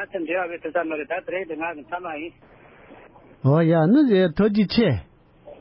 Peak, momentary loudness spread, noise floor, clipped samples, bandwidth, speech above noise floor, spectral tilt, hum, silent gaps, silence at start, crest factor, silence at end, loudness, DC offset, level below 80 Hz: -8 dBFS; 14 LU; -48 dBFS; under 0.1%; 5.8 kHz; 27 dB; -12 dB/octave; none; none; 0 s; 14 dB; 0.05 s; -22 LUFS; under 0.1%; -50 dBFS